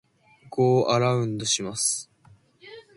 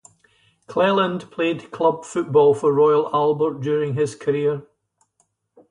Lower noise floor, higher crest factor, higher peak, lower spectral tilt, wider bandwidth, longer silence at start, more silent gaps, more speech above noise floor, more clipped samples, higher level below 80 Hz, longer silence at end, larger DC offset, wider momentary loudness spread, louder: second, -57 dBFS vs -68 dBFS; about the same, 18 dB vs 16 dB; about the same, -8 dBFS vs -6 dBFS; second, -4 dB/octave vs -6.5 dB/octave; about the same, 11.5 kHz vs 10.5 kHz; second, 0.45 s vs 0.7 s; neither; second, 34 dB vs 49 dB; neither; about the same, -64 dBFS vs -66 dBFS; second, 0.15 s vs 1.1 s; neither; about the same, 7 LU vs 8 LU; second, -24 LUFS vs -20 LUFS